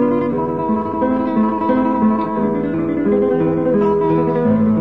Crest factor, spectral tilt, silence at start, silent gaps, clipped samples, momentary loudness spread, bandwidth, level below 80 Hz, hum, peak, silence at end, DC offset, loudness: 12 dB; -10.5 dB/octave; 0 s; none; under 0.1%; 4 LU; 4.5 kHz; -44 dBFS; none; -4 dBFS; 0 s; 0.5%; -17 LUFS